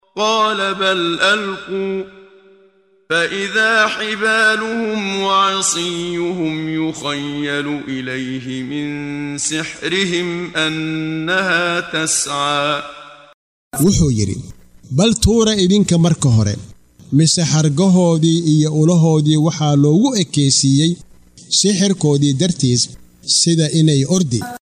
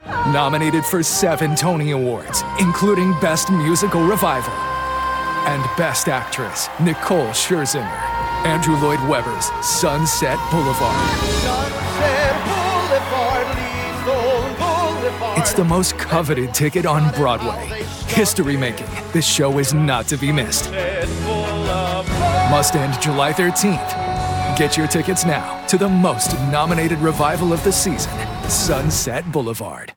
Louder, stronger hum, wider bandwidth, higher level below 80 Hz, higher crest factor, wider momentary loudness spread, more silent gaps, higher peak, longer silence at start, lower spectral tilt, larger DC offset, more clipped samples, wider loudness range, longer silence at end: about the same, -16 LUFS vs -18 LUFS; neither; second, 14.5 kHz vs 18 kHz; about the same, -40 dBFS vs -36 dBFS; about the same, 16 dB vs 16 dB; first, 10 LU vs 6 LU; first, 13.34-13.71 s vs none; about the same, -2 dBFS vs -4 dBFS; about the same, 0.15 s vs 0.05 s; about the same, -4.5 dB/octave vs -4 dB/octave; neither; neither; first, 7 LU vs 2 LU; first, 0.2 s vs 0.05 s